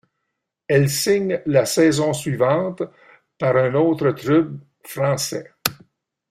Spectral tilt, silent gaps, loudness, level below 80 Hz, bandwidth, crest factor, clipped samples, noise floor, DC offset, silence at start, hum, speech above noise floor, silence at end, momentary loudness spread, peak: -5 dB/octave; none; -20 LUFS; -58 dBFS; 16 kHz; 20 dB; under 0.1%; -78 dBFS; under 0.1%; 0.7 s; none; 60 dB; 0.55 s; 10 LU; 0 dBFS